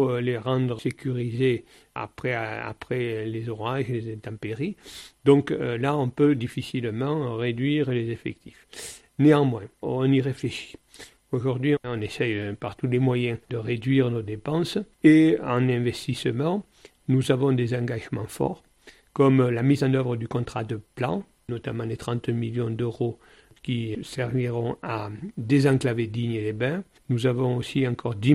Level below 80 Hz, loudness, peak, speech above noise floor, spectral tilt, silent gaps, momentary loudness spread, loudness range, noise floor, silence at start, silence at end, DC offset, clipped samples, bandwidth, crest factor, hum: -56 dBFS; -25 LUFS; -6 dBFS; 25 dB; -7.5 dB/octave; none; 13 LU; 6 LU; -49 dBFS; 0 s; 0 s; under 0.1%; under 0.1%; 13 kHz; 20 dB; none